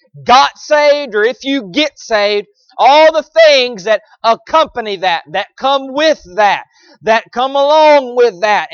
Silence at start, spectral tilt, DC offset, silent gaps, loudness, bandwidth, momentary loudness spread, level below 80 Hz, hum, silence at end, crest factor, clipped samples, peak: 0.15 s; -2.5 dB/octave; under 0.1%; none; -11 LUFS; 7 kHz; 9 LU; -54 dBFS; none; 0.05 s; 12 dB; under 0.1%; 0 dBFS